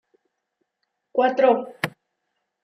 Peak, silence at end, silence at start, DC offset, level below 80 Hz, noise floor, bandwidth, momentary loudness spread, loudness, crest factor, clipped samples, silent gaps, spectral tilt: -6 dBFS; 0.75 s; 1.15 s; under 0.1%; -78 dBFS; -78 dBFS; 15.5 kHz; 12 LU; -22 LUFS; 20 dB; under 0.1%; none; -5.5 dB/octave